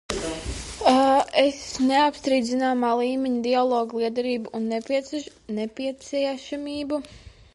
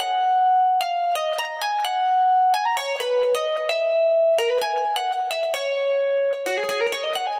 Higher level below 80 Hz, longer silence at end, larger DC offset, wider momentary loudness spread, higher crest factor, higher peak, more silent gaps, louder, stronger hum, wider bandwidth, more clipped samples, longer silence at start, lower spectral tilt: first, -48 dBFS vs -76 dBFS; first, 0.25 s vs 0 s; neither; first, 12 LU vs 6 LU; first, 18 dB vs 12 dB; first, -6 dBFS vs -10 dBFS; neither; second, -24 LUFS vs -21 LUFS; neither; second, 11.5 kHz vs 17 kHz; neither; about the same, 0.1 s vs 0 s; first, -4 dB/octave vs 0.5 dB/octave